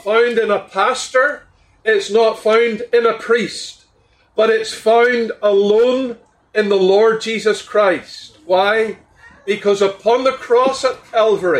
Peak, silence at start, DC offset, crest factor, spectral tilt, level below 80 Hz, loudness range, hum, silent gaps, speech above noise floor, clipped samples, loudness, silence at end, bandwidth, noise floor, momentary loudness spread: -2 dBFS; 0.05 s; under 0.1%; 12 dB; -4 dB/octave; -60 dBFS; 2 LU; none; none; 41 dB; under 0.1%; -16 LUFS; 0 s; 11.5 kHz; -56 dBFS; 10 LU